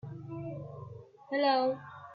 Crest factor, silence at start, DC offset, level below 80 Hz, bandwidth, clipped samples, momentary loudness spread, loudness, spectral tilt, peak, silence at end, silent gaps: 18 dB; 0.05 s; under 0.1%; -72 dBFS; 5.2 kHz; under 0.1%; 20 LU; -33 LUFS; -8.5 dB/octave; -16 dBFS; 0 s; none